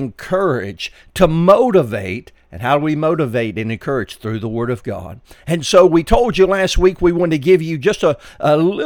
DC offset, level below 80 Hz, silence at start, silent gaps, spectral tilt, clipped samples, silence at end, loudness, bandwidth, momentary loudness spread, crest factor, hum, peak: under 0.1%; -30 dBFS; 0 s; none; -6 dB/octave; under 0.1%; 0 s; -16 LUFS; 18 kHz; 14 LU; 16 dB; none; 0 dBFS